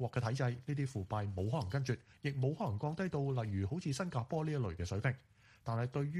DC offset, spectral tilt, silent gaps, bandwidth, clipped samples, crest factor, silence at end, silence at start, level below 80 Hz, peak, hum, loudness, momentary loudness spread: under 0.1%; -7 dB/octave; none; 11.5 kHz; under 0.1%; 16 dB; 0 s; 0 s; -62 dBFS; -20 dBFS; none; -38 LUFS; 3 LU